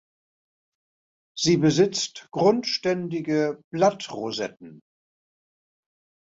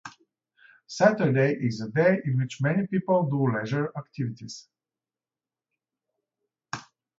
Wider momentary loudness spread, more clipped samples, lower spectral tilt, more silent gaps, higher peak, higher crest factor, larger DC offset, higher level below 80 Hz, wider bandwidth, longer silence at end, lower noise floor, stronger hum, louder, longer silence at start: second, 11 LU vs 17 LU; neither; second, -5 dB/octave vs -7 dB/octave; first, 3.64-3.71 s vs none; about the same, -8 dBFS vs -6 dBFS; about the same, 18 dB vs 22 dB; neither; about the same, -66 dBFS vs -68 dBFS; about the same, 8 kHz vs 7.8 kHz; first, 1.5 s vs 0.4 s; about the same, under -90 dBFS vs under -90 dBFS; neither; about the same, -24 LUFS vs -25 LUFS; first, 1.35 s vs 0.05 s